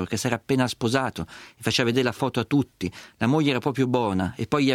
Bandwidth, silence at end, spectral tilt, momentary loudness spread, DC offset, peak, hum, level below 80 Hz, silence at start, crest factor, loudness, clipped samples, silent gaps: 16 kHz; 0 s; -5.5 dB/octave; 9 LU; under 0.1%; -6 dBFS; none; -56 dBFS; 0 s; 18 dB; -24 LUFS; under 0.1%; none